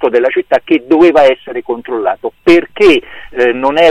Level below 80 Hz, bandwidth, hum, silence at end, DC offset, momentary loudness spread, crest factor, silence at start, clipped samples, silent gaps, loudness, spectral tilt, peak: -42 dBFS; 9 kHz; none; 0 s; under 0.1%; 11 LU; 10 dB; 0 s; under 0.1%; none; -11 LUFS; -5 dB/octave; 0 dBFS